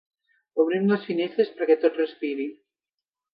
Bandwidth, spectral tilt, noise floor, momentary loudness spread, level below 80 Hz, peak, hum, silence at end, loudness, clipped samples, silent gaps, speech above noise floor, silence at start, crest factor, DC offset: 5.2 kHz; -10 dB/octave; -88 dBFS; 10 LU; -80 dBFS; -8 dBFS; none; 0.8 s; -25 LUFS; under 0.1%; none; 65 dB; 0.55 s; 18 dB; under 0.1%